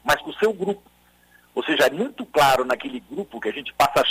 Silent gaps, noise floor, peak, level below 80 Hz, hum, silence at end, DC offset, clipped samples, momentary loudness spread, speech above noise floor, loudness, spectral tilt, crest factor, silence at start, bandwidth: none; -56 dBFS; -6 dBFS; -54 dBFS; 60 Hz at -60 dBFS; 0 s; under 0.1%; under 0.1%; 14 LU; 35 dB; -22 LUFS; -3.5 dB/octave; 16 dB; 0.05 s; 16 kHz